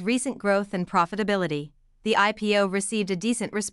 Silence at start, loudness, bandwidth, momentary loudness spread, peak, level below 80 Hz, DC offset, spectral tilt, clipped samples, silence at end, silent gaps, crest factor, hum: 0 s; -25 LUFS; 12 kHz; 7 LU; -8 dBFS; -60 dBFS; under 0.1%; -4 dB/octave; under 0.1%; 0.05 s; none; 18 dB; none